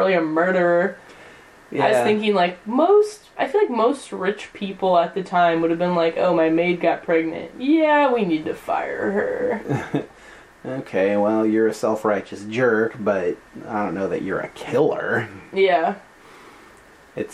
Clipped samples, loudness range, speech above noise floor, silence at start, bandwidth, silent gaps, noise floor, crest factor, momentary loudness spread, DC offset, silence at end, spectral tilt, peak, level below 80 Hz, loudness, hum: under 0.1%; 4 LU; 28 dB; 0 s; 13 kHz; none; -48 dBFS; 16 dB; 11 LU; under 0.1%; 0 s; -6 dB/octave; -4 dBFS; -60 dBFS; -21 LUFS; none